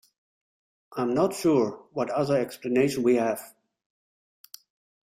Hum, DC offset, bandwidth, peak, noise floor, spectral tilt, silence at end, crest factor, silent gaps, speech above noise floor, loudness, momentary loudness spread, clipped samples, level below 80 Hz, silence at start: none; under 0.1%; 16 kHz; -10 dBFS; under -90 dBFS; -6 dB/octave; 1.55 s; 18 dB; none; over 65 dB; -26 LUFS; 9 LU; under 0.1%; -68 dBFS; 0.9 s